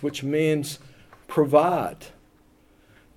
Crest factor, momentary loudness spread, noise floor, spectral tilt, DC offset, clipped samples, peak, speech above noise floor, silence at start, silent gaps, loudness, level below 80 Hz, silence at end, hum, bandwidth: 22 dB; 17 LU; -58 dBFS; -6 dB/octave; under 0.1%; under 0.1%; -4 dBFS; 35 dB; 0 s; none; -23 LUFS; -60 dBFS; 1.1 s; none; 17.5 kHz